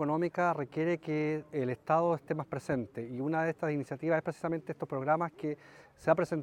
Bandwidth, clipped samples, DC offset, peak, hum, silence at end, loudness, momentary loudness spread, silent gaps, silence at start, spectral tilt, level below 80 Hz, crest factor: 12 kHz; under 0.1%; under 0.1%; -12 dBFS; none; 0 s; -33 LUFS; 8 LU; none; 0 s; -8 dB/octave; -70 dBFS; 20 dB